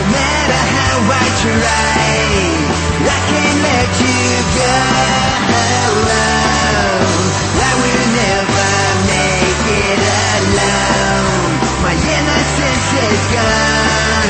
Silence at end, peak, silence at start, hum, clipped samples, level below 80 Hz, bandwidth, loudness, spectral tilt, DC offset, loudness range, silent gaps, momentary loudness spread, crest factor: 0 s; 0 dBFS; 0 s; none; under 0.1%; -26 dBFS; 8.8 kHz; -12 LUFS; -3.5 dB/octave; under 0.1%; 1 LU; none; 2 LU; 12 dB